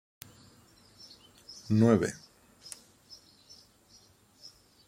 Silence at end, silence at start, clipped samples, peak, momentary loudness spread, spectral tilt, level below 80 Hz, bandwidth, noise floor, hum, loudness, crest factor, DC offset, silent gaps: 2.7 s; 1.5 s; under 0.1%; -12 dBFS; 28 LU; -6.5 dB/octave; -68 dBFS; 16.5 kHz; -61 dBFS; none; -27 LUFS; 22 dB; under 0.1%; none